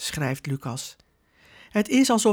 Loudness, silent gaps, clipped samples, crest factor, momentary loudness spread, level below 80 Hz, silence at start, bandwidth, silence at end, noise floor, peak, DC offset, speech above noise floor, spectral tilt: -25 LUFS; none; under 0.1%; 16 dB; 14 LU; -58 dBFS; 0 s; 19.5 kHz; 0 s; -59 dBFS; -10 dBFS; under 0.1%; 36 dB; -4.5 dB/octave